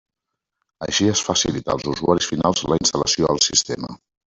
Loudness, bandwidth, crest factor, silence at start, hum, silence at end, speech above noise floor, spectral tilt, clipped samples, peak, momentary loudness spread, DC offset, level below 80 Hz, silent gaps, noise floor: -19 LUFS; 8.4 kHz; 20 dB; 0.8 s; none; 0.35 s; 62 dB; -3 dB/octave; under 0.1%; -2 dBFS; 10 LU; under 0.1%; -48 dBFS; none; -82 dBFS